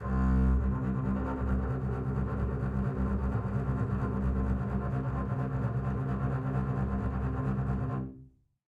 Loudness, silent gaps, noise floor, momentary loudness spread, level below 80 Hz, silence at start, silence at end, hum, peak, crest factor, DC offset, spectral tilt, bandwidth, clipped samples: -32 LUFS; none; -56 dBFS; 4 LU; -36 dBFS; 0 s; 0.45 s; none; -16 dBFS; 14 dB; under 0.1%; -10.5 dB/octave; 3.5 kHz; under 0.1%